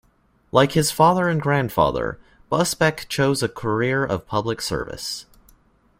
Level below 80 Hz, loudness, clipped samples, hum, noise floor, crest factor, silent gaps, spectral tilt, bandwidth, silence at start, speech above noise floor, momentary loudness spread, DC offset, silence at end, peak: -46 dBFS; -21 LUFS; under 0.1%; none; -60 dBFS; 20 dB; none; -5 dB/octave; 16 kHz; 0.55 s; 40 dB; 12 LU; under 0.1%; 0.8 s; -2 dBFS